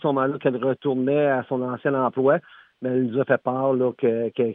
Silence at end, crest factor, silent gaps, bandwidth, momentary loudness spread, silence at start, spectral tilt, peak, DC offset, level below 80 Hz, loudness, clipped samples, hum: 0 s; 16 dB; none; 3.8 kHz; 4 LU; 0.05 s; -11 dB/octave; -6 dBFS; under 0.1%; -76 dBFS; -23 LUFS; under 0.1%; none